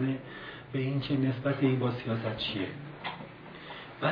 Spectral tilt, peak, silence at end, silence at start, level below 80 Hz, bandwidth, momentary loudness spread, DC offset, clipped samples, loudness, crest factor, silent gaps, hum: -9 dB/octave; -14 dBFS; 0 s; 0 s; -62 dBFS; 5.2 kHz; 16 LU; under 0.1%; under 0.1%; -32 LUFS; 18 dB; none; none